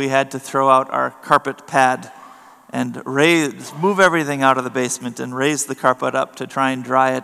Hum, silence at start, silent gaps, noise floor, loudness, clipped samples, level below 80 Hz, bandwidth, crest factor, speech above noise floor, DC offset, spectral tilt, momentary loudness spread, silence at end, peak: none; 0 s; none; -43 dBFS; -18 LUFS; under 0.1%; -68 dBFS; 15 kHz; 18 dB; 25 dB; under 0.1%; -4 dB/octave; 10 LU; 0 s; 0 dBFS